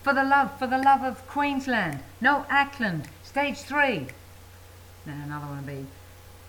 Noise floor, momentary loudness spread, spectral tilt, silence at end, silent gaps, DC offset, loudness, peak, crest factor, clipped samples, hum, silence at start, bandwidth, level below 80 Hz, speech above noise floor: -48 dBFS; 17 LU; -5 dB/octave; 0 s; none; under 0.1%; -25 LUFS; -8 dBFS; 18 dB; under 0.1%; none; 0 s; 19 kHz; -56 dBFS; 22 dB